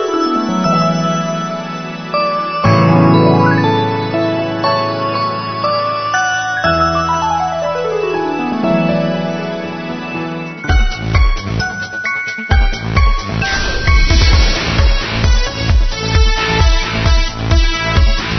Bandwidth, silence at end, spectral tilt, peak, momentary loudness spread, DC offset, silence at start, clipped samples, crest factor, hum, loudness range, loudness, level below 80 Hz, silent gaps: 6.4 kHz; 0 s; -5.5 dB/octave; 0 dBFS; 8 LU; under 0.1%; 0 s; under 0.1%; 14 dB; none; 4 LU; -15 LUFS; -18 dBFS; none